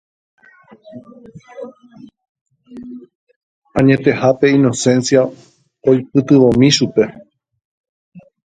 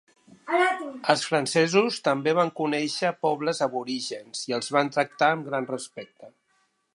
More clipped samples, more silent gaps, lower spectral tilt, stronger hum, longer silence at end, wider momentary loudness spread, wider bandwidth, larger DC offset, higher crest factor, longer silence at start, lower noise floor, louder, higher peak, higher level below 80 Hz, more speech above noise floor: neither; first, 2.29-2.35 s, 2.41-2.46 s, 3.15-3.27 s, 3.36-3.62 s, 7.65-8.12 s vs none; first, -5.5 dB/octave vs -4 dB/octave; neither; second, 0.25 s vs 0.65 s; first, 23 LU vs 11 LU; second, 9.4 kHz vs 11.5 kHz; neither; second, 16 dB vs 24 dB; first, 0.95 s vs 0.45 s; second, -34 dBFS vs -70 dBFS; first, -13 LUFS vs -25 LUFS; about the same, 0 dBFS vs -2 dBFS; first, -52 dBFS vs -78 dBFS; second, 20 dB vs 44 dB